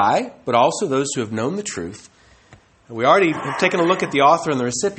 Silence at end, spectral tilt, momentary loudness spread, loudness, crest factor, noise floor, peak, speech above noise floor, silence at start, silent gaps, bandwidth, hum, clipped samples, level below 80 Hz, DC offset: 0 s; -4 dB/octave; 11 LU; -18 LUFS; 18 dB; -50 dBFS; -2 dBFS; 32 dB; 0 s; none; 8.8 kHz; none; under 0.1%; -58 dBFS; under 0.1%